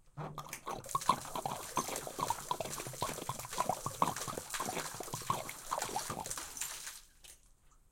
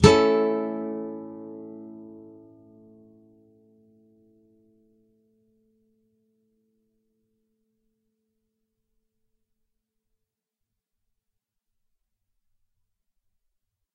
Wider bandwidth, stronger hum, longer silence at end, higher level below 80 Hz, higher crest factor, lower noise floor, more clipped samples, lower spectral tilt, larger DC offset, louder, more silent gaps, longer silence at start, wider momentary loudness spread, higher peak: first, 17 kHz vs 11 kHz; neither; second, 0.15 s vs 11.75 s; second, -60 dBFS vs -48 dBFS; about the same, 26 dB vs 30 dB; second, -64 dBFS vs -85 dBFS; neither; second, -2.5 dB/octave vs -6 dB/octave; neither; second, -39 LUFS vs -24 LUFS; neither; about the same, 0.05 s vs 0 s; second, 9 LU vs 26 LU; second, -14 dBFS vs 0 dBFS